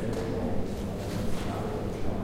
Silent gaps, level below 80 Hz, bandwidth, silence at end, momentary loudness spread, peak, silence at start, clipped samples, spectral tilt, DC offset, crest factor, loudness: none; -38 dBFS; 16 kHz; 0 s; 2 LU; -16 dBFS; 0 s; under 0.1%; -7 dB/octave; under 0.1%; 14 dB; -33 LUFS